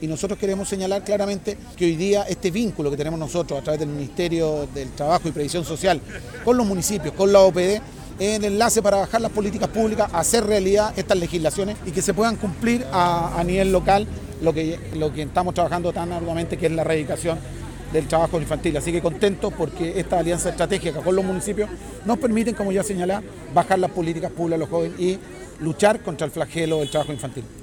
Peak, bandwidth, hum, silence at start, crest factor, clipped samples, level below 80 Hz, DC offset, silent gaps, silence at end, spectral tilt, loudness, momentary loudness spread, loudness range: -4 dBFS; 19 kHz; none; 0 s; 18 dB; under 0.1%; -40 dBFS; under 0.1%; none; 0 s; -5 dB/octave; -22 LUFS; 8 LU; 4 LU